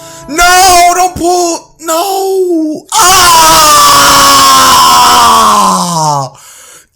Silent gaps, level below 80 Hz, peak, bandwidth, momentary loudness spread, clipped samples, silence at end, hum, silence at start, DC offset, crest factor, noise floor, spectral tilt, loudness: none; -32 dBFS; 0 dBFS; over 20 kHz; 11 LU; 2%; 0.65 s; none; 0 s; under 0.1%; 6 dB; -34 dBFS; -1.5 dB/octave; -4 LUFS